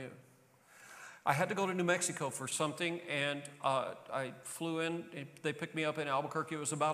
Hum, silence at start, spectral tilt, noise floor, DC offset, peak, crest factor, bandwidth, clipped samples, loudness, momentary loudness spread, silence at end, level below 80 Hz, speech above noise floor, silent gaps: none; 0 s; -3.5 dB/octave; -65 dBFS; under 0.1%; -16 dBFS; 22 dB; 15 kHz; under 0.1%; -36 LUFS; 10 LU; 0 s; -86 dBFS; 28 dB; none